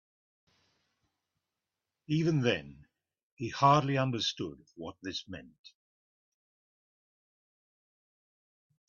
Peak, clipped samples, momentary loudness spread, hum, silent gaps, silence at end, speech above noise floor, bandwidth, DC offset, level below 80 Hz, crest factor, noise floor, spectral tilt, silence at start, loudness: -12 dBFS; under 0.1%; 20 LU; none; 3.23-3.37 s, 5.59-5.64 s; 3.2 s; 58 dB; 7.2 kHz; under 0.1%; -70 dBFS; 24 dB; -89 dBFS; -4.5 dB/octave; 2.1 s; -31 LUFS